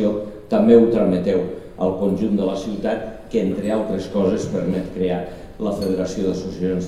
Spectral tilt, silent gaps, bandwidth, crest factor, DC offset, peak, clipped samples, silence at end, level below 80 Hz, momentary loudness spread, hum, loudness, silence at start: -7.5 dB/octave; none; 12.5 kHz; 18 dB; 0.4%; 0 dBFS; under 0.1%; 0 s; -44 dBFS; 11 LU; none; -20 LUFS; 0 s